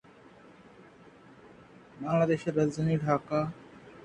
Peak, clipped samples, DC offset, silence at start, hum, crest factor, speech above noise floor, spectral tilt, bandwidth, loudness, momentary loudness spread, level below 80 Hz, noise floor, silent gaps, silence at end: -12 dBFS; under 0.1%; under 0.1%; 1.45 s; none; 20 dB; 27 dB; -8 dB/octave; 9.2 kHz; -29 LUFS; 15 LU; -64 dBFS; -55 dBFS; none; 0 s